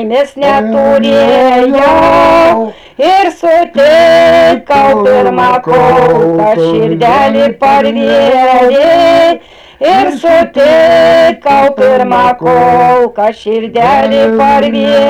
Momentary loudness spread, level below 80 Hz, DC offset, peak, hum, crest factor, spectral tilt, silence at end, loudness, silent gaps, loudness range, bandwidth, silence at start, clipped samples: 5 LU; -38 dBFS; under 0.1%; -2 dBFS; none; 6 dB; -5.5 dB/octave; 0 s; -7 LUFS; none; 1 LU; 14 kHz; 0 s; under 0.1%